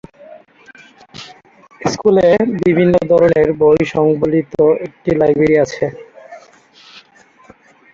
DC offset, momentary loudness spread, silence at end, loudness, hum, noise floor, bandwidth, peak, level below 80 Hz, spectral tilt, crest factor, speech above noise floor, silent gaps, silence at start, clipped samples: under 0.1%; 11 LU; 0.95 s; -13 LUFS; none; -47 dBFS; 7.4 kHz; 0 dBFS; -46 dBFS; -7 dB/octave; 14 dB; 35 dB; none; 0.3 s; under 0.1%